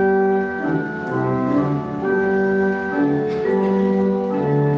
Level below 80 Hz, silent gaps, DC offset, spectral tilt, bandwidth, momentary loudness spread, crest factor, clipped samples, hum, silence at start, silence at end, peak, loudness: -54 dBFS; none; under 0.1%; -9.5 dB/octave; 6.6 kHz; 4 LU; 12 dB; under 0.1%; none; 0 s; 0 s; -8 dBFS; -20 LUFS